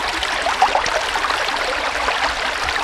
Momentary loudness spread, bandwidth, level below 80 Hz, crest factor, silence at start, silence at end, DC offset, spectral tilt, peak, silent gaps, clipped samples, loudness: 3 LU; 16 kHz; -40 dBFS; 18 dB; 0 s; 0 s; under 0.1%; -1 dB/octave; -2 dBFS; none; under 0.1%; -19 LUFS